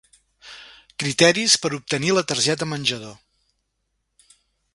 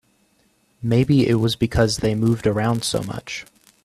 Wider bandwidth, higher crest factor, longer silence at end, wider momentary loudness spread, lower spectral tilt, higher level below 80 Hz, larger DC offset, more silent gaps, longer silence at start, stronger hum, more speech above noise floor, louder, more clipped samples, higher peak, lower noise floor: second, 11.5 kHz vs 13.5 kHz; first, 24 dB vs 16 dB; first, 1.6 s vs 0.4 s; first, 25 LU vs 13 LU; second, -2.5 dB/octave vs -6 dB/octave; second, -62 dBFS vs -42 dBFS; neither; neither; second, 0.45 s vs 0.8 s; neither; first, 54 dB vs 43 dB; about the same, -19 LUFS vs -20 LUFS; neither; first, 0 dBFS vs -4 dBFS; first, -74 dBFS vs -62 dBFS